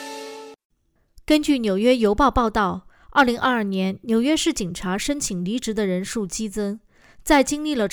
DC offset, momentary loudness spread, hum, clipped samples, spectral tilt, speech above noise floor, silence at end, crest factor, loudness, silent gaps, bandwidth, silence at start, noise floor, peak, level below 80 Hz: under 0.1%; 12 LU; none; under 0.1%; -4.5 dB/octave; 33 dB; 0 s; 16 dB; -21 LUFS; 0.65-0.70 s; over 20 kHz; 0 s; -53 dBFS; -6 dBFS; -42 dBFS